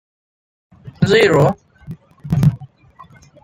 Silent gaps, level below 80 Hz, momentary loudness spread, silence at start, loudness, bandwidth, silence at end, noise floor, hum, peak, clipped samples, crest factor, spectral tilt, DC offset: none; -44 dBFS; 25 LU; 0.85 s; -15 LUFS; 15.5 kHz; 0.8 s; -45 dBFS; none; -2 dBFS; under 0.1%; 16 dB; -6.5 dB/octave; under 0.1%